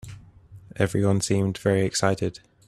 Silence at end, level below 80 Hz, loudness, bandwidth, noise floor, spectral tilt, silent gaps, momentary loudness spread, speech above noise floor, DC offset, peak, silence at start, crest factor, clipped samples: 0.3 s; -54 dBFS; -24 LUFS; 13.5 kHz; -48 dBFS; -5.5 dB/octave; none; 11 LU; 25 dB; under 0.1%; -6 dBFS; 0.05 s; 20 dB; under 0.1%